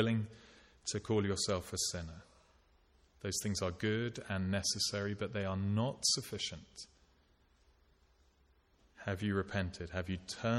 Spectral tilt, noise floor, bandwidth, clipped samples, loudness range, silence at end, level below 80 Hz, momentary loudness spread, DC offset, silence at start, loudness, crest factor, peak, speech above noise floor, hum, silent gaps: -4 dB/octave; -70 dBFS; 16 kHz; under 0.1%; 8 LU; 0 s; -62 dBFS; 13 LU; under 0.1%; 0 s; -37 LUFS; 20 dB; -20 dBFS; 34 dB; none; none